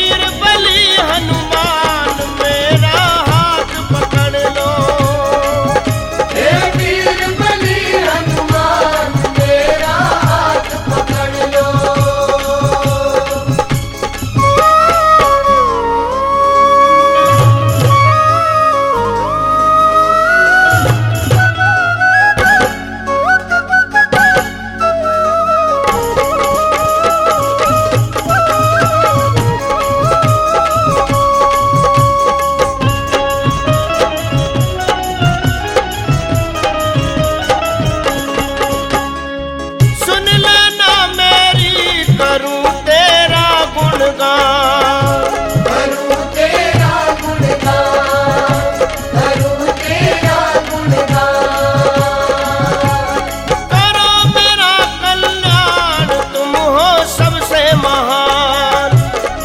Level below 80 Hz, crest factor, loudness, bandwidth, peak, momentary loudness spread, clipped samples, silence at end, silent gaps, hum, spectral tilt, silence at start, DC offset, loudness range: -30 dBFS; 12 dB; -11 LUFS; 16.5 kHz; 0 dBFS; 7 LU; under 0.1%; 0 s; none; none; -4.5 dB/octave; 0 s; under 0.1%; 4 LU